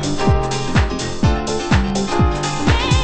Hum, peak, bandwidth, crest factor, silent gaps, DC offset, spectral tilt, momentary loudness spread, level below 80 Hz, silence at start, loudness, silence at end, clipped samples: none; 0 dBFS; 8.8 kHz; 16 dB; none; under 0.1%; -5.5 dB/octave; 2 LU; -22 dBFS; 0 s; -18 LUFS; 0 s; under 0.1%